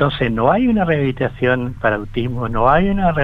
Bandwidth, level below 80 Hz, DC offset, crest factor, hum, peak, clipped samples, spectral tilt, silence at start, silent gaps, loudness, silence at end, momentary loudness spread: 5.8 kHz; -30 dBFS; under 0.1%; 16 dB; none; 0 dBFS; under 0.1%; -9 dB/octave; 0 s; none; -17 LUFS; 0 s; 7 LU